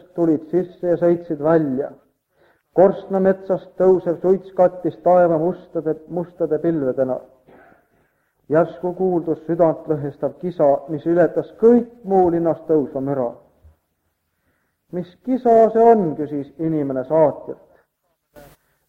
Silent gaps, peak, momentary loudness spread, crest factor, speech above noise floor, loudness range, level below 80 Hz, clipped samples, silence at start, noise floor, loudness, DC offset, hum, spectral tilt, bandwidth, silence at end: none; -2 dBFS; 11 LU; 18 dB; 53 dB; 5 LU; -58 dBFS; under 0.1%; 0.15 s; -71 dBFS; -19 LUFS; under 0.1%; none; -10.5 dB/octave; 4.5 kHz; 0.5 s